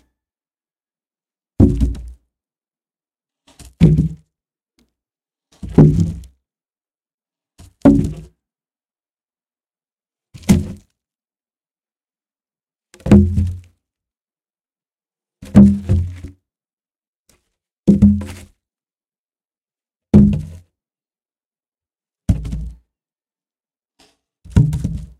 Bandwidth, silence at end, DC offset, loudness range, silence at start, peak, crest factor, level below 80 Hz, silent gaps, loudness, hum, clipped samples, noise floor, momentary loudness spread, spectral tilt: 12.5 kHz; 0.15 s; under 0.1%; 8 LU; 1.6 s; 0 dBFS; 20 dB; -30 dBFS; 7.14-7.18 s, 14.21-14.25 s, 16.73-16.77 s, 17.07-17.24 s, 17.79-17.83 s, 19.18-19.24 s, 21.46-21.51 s, 21.68-21.72 s; -15 LUFS; none; under 0.1%; under -90 dBFS; 21 LU; -9 dB/octave